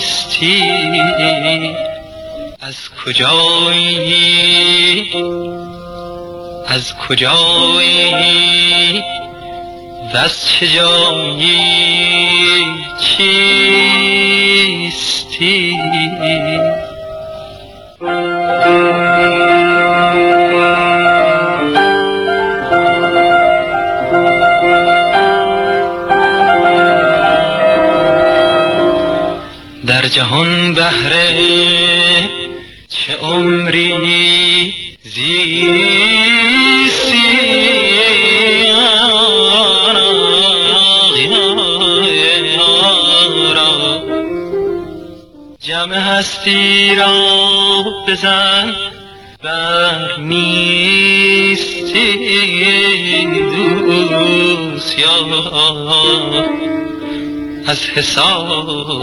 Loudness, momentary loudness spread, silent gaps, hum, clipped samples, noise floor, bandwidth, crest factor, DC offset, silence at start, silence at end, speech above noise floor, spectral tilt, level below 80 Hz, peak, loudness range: -10 LUFS; 13 LU; none; none; under 0.1%; -36 dBFS; 12.5 kHz; 12 dB; 0.2%; 0 s; 0 s; 24 dB; -3.5 dB/octave; -46 dBFS; 0 dBFS; 5 LU